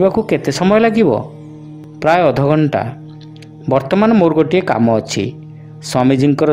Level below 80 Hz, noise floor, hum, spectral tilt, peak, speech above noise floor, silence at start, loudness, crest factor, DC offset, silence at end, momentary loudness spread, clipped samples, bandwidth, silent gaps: -48 dBFS; -34 dBFS; none; -6.5 dB/octave; 0 dBFS; 22 dB; 0 s; -14 LUFS; 14 dB; under 0.1%; 0 s; 22 LU; under 0.1%; 15.5 kHz; none